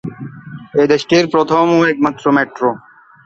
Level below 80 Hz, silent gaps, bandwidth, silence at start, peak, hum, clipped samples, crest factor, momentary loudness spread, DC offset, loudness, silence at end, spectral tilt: -54 dBFS; none; 7.8 kHz; 0.05 s; 0 dBFS; none; under 0.1%; 14 dB; 19 LU; under 0.1%; -14 LUFS; 0.5 s; -5.5 dB/octave